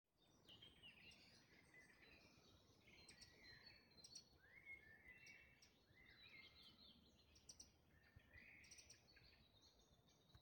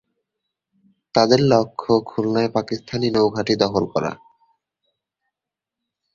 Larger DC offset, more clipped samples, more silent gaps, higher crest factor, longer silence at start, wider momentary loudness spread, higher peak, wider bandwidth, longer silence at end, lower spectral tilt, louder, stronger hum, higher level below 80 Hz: neither; neither; neither; about the same, 20 dB vs 20 dB; second, 0.05 s vs 1.15 s; second, 6 LU vs 9 LU; second, -48 dBFS vs 0 dBFS; first, 17 kHz vs 7.4 kHz; second, 0 s vs 2 s; second, -2 dB/octave vs -6 dB/octave; second, -66 LUFS vs -20 LUFS; neither; second, -84 dBFS vs -56 dBFS